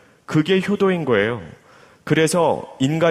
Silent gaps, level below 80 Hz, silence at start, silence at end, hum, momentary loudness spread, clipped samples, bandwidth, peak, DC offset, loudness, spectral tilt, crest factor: none; -56 dBFS; 0.3 s; 0 s; none; 6 LU; under 0.1%; 15 kHz; -4 dBFS; under 0.1%; -19 LUFS; -5.5 dB/octave; 16 dB